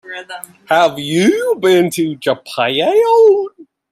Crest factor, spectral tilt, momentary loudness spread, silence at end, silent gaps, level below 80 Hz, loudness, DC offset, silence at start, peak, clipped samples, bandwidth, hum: 14 dB; -4.5 dB/octave; 18 LU; 0.3 s; none; -62 dBFS; -13 LUFS; under 0.1%; 0.05 s; 0 dBFS; under 0.1%; 15.5 kHz; none